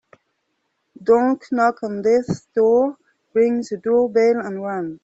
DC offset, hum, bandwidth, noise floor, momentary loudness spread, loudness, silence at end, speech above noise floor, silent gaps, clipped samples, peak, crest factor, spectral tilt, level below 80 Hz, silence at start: under 0.1%; none; 8 kHz; -72 dBFS; 8 LU; -19 LUFS; 0.1 s; 54 dB; none; under 0.1%; -4 dBFS; 16 dB; -7 dB/octave; -62 dBFS; 1 s